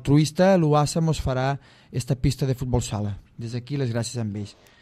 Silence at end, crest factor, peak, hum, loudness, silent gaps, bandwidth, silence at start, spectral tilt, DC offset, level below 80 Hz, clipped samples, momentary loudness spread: 0.3 s; 16 dB; -6 dBFS; none; -24 LUFS; none; 14 kHz; 0 s; -6.5 dB/octave; under 0.1%; -40 dBFS; under 0.1%; 15 LU